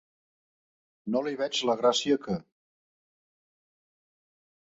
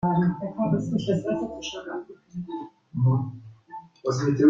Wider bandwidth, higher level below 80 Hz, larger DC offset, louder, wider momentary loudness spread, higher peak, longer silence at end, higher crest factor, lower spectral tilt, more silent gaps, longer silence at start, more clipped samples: about the same, 8.2 kHz vs 7.6 kHz; second, -68 dBFS vs -58 dBFS; neither; about the same, -28 LUFS vs -28 LUFS; second, 11 LU vs 16 LU; second, -10 dBFS vs -6 dBFS; first, 2.3 s vs 0 s; about the same, 22 dB vs 18 dB; second, -4 dB/octave vs -7.5 dB/octave; neither; first, 1.05 s vs 0 s; neither